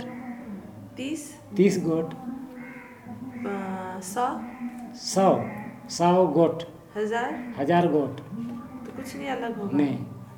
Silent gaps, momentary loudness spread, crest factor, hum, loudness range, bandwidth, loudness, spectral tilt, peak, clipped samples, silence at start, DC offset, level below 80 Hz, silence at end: none; 17 LU; 20 dB; none; 5 LU; 19 kHz; -27 LUFS; -6 dB/octave; -6 dBFS; under 0.1%; 0 s; under 0.1%; -64 dBFS; 0 s